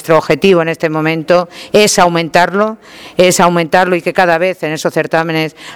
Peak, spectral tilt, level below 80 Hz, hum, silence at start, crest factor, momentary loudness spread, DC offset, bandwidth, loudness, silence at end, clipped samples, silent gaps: 0 dBFS; -4 dB/octave; -48 dBFS; none; 0 s; 12 dB; 7 LU; under 0.1%; 19.5 kHz; -11 LUFS; 0 s; 0.5%; none